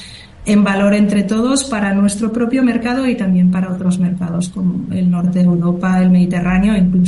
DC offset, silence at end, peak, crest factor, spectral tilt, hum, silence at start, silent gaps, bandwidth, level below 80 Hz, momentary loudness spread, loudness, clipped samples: under 0.1%; 0 s; -2 dBFS; 12 dB; -6.5 dB/octave; none; 0 s; none; 11.5 kHz; -38 dBFS; 6 LU; -15 LUFS; under 0.1%